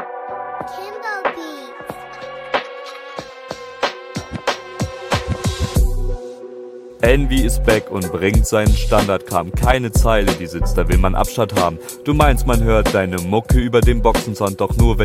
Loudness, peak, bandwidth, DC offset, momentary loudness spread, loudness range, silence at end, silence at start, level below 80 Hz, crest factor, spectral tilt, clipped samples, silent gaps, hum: -18 LUFS; 0 dBFS; 16 kHz; under 0.1%; 16 LU; 10 LU; 0 s; 0 s; -22 dBFS; 18 dB; -5.5 dB/octave; under 0.1%; none; none